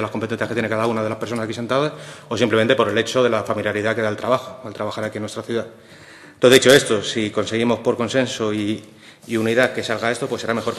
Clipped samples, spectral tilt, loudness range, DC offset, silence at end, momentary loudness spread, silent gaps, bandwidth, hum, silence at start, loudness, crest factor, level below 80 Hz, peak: under 0.1%; -4 dB/octave; 4 LU; under 0.1%; 0 s; 12 LU; none; 13 kHz; none; 0 s; -20 LUFS; 20 dB; -60 dBFS; 0 dBFS